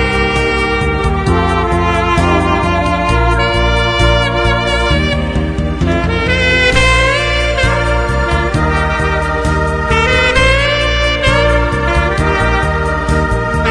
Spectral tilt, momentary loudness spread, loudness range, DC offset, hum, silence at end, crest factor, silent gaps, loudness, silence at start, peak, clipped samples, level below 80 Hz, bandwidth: -5.5 dB/octave; 5 LU; 1 LU; under 0.1%; none; 0 s; 12 dB; none; -12 LUFS; 0 s; 0 dBFS; under 0.1%; -18 dBFS; 10.5 kHz